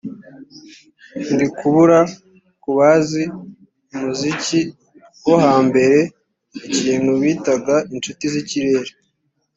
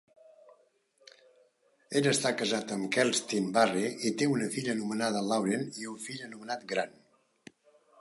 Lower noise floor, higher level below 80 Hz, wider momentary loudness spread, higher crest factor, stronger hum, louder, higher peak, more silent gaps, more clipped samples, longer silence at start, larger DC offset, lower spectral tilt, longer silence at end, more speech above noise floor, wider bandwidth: about the same, -69 dBFS vs -68 dBFS; first, -58 dBFS vs -80 dBFS; first, 18 LU vs 12 LU; about the same, 16 dB vs 20 dB; neither; first, -17 LUFS vs -30 LUFS; first, -2 dBFS vs -12 dBFS; neither; neither; second, 0.05 s vs 1.9 s; neither; first, -5.5 dB/octave vs -4 dB/octave; second, 0.65 s vs 1.1 s; first, 52 dB vs 37 dB; second, 8 kHz vs 12 kHz